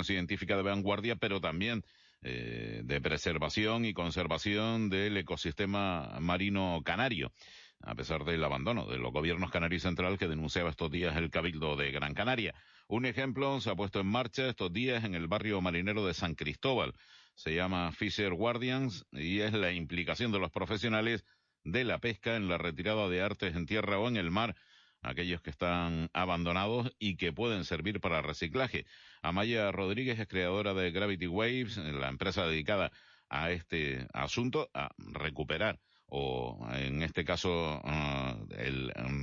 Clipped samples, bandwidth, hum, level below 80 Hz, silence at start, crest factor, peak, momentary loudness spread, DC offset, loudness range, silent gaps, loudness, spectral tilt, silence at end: under 0.1%; 7.6 kHz; none; -54 dBFS; 0 s; 18 dB; -16 dBFS; 7 LU; under 0.1%; 2 LU; none; -34 LUFS; -4 dB/octave; 0 s